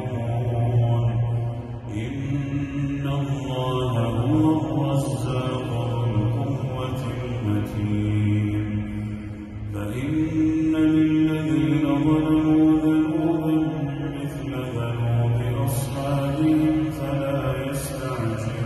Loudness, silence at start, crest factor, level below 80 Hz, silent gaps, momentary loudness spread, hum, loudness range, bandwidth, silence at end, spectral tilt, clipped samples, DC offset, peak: -23 LUFS; 0 s; 14 dB; -42 dBFS; none; 9 LU; none; 5 LU; 12.5 kHz; 0 s; -7.5 dB/octave; under 0.1%; under 0.1%; -10 dBFS